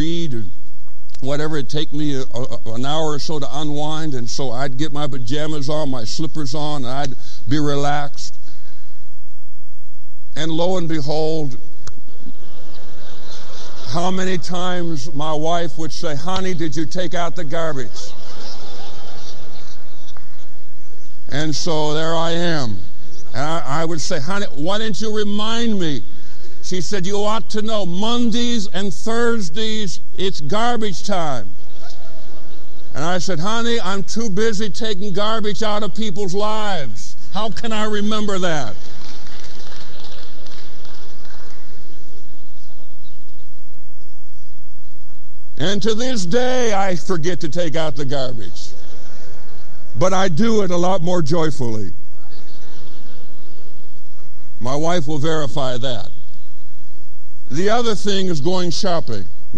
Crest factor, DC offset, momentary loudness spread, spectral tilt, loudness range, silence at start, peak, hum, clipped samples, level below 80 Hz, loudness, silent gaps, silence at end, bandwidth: 18 dB; 40%; 22 LU; -5 dB/octave; 7 LU; 0 s; -2 dBFS; 60 Hz at -50 dBFS; under 0.1%; -44 dBFS; -22 LUFS; none; 0 s; 13 kHz